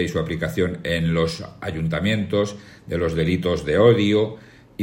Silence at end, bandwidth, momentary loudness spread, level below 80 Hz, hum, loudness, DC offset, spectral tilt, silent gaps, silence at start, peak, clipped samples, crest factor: 0 s; 16.5 kHz; 14 LU; -46 dBFS; none; -22 LUFS; under 0.1%; -6.5 dB/octave; none; 0 s; -2 dBFS; under 0.1%; 20 dB